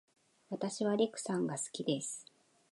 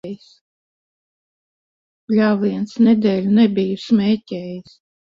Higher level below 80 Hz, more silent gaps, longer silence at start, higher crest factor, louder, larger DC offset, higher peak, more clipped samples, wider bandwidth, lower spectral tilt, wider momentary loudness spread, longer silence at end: second, -86 dBFS vs -62 dBFS; second, none vs 0.41-2.08 s; first, 0.5 s vs 0.05 s; about the same, 18 dB vs 16 dB; second, -36 LUFS vs -17 LUFS; neither; second, -20 dBFS vs -4 dBFS; neither; first, 11.5 kHz vs 7.2 kHz; second, -4.5 dB/octave vs -8 dB/octave; second, 10 LU vs 18 LU; about the same, 0.5 s vs 0.45 s